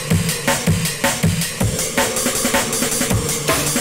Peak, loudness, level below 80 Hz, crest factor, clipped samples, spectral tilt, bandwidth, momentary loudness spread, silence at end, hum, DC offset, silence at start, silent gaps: -4 dBFS; -17 LUFS; -36 dBFS; 14 dB; under 0.1%; -3.5 dB/octave; 16.5 kHz; 2 LU; 0 s; none; under 0.1%; 0 s; none